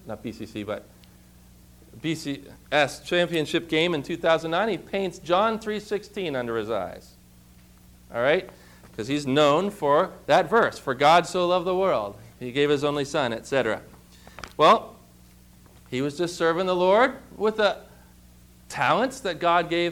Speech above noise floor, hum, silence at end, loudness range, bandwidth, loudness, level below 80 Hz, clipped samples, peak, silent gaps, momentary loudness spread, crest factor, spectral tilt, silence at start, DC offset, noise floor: 28 dB; 60 Hz at -55 dBFS; 0 s; 7 LU; 18.5 kHz; -24 LUFS; -56 dBFS; under 0.1%; -8 dBFS; none; 16 LU; 18 dB; -5 dB/octave; 0.05 s; under 0.1%; -52 dBFS